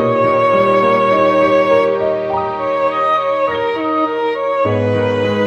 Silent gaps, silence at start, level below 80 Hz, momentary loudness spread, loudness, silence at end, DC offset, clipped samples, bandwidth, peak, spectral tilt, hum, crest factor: none; 0 s; -52 dBFS; 6 LU; -14 LUFS; 0 s; under 0.1%; under 0.1%; 7.8 kHz; -2 dBFS; -7 dB/octave; none; 12 dB